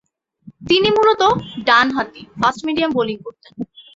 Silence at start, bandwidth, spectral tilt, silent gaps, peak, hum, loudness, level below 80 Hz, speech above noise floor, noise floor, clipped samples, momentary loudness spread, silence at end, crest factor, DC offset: 0.45 s; 7.8 kHz; -4.5 dB/octave; none; -2 dBFS; none; -16 LUFS; -52 dBFS; 28 dB; -45 dBFS; under 0.1%; 18 LU; 0.15 s; 16 dB; under 0.1%